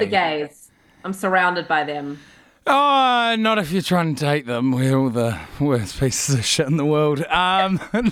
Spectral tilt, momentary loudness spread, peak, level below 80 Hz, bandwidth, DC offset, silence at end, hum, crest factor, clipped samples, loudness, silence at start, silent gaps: -4.5 dB/octave; 11 LU; -4 dBFS; -48 dBFS; 17.5 kHz; under 0.1%; 0 s; none; 16 dB; under 0.1%; -19 LUFS; 0 s; none